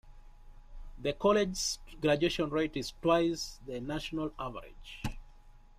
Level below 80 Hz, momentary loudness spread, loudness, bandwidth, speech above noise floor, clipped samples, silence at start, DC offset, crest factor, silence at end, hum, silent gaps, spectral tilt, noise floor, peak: -50 dBFS; 14 LU; -33 LUFS; 15.5 kHz; 23 dB; under 0.1%; 0.05 s; under 0.1%; 18 dB; 0.2 s; none; none; -4.5 dB/octave; -55 dBFS; -14 dBFS